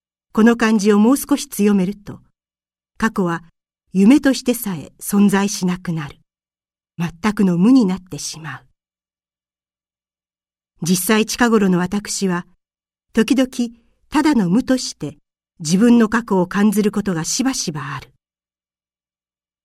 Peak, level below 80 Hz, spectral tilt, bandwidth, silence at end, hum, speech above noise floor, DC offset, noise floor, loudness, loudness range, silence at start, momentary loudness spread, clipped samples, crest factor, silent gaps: 0 dBFS; -50 dBFS; -5 dB/octave; 15 kHz; 1.6 s; none; over 74 dB; under 0.1%; under -90 dBFS; -17 LUFS; 4 LU; 0.35 s; 14 LU; under 0.1%; 18 dB; none